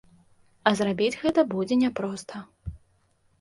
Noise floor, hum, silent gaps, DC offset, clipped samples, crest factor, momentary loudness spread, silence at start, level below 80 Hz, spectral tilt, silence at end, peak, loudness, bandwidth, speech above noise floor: -66 dBFS; none; none; under 0.1%; under 0.1%; 22 dB; 18 LU; 0.65 s; -52 dBFS; -5.5 dB/octave; 0.65 s; -4 dBFS; -25 LUFS; 11.5 kHz; 41 dB